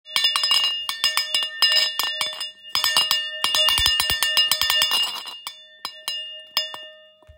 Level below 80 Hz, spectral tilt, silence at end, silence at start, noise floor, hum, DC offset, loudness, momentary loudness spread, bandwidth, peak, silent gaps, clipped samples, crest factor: -50 dBFS; 1.5 dB/octave; 0.05 s; 0.05 s; -48 dBFS; none; under 0.1%; -19 LUFS; 14 LU; 17 kHz; -2 dBFS; none; under 0.1%; 22 dB